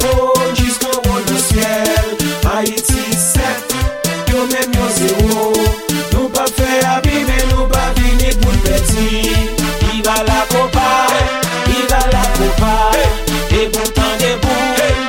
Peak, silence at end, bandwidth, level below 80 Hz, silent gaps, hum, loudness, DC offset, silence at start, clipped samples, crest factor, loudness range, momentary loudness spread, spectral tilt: 0 dBFS; 0 s; 17 kHz; -18 dBFS; none; none; -14 LUFS; under 0.1%; 0 s; under 0.1%; 12 dB; 1 LU; 3 LU; -4 dB/octave